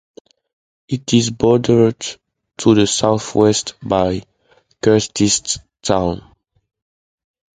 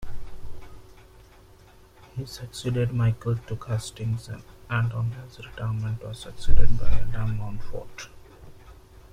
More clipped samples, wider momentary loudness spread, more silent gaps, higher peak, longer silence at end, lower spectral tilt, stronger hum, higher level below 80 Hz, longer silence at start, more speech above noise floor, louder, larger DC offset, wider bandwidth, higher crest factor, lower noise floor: neither; second, 12 LU vs 24 LU; neither; about the same, 0 dBFS vs -2 dBFS; first, 1.35 s vs 1.05 s; second, -4.5 dB/octave vs -6.5 dB/octave; neither; second, -44 dBFS vs -32 dBFS; first, 0.9 s vs 0 s; first, 42 dB vs 33 dB; first, -16 LUFS vs -30 LUFS; neither; about the same, 9.6 kHz vs 9.8 kHz; about the same, 18 dB vs 20 dB; first, -57 dBFS vs -52 dBFS